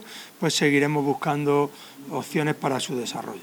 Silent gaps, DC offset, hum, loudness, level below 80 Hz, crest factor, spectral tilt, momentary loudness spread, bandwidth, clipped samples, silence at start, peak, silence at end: none; under 0.1%; none; -24 LUFS; -70 dBFS; 16 dB; -4.5 dB/octave; 13 LU; over 20 kHz; under 0.1%; 0 s; -8 dBFS; 0 s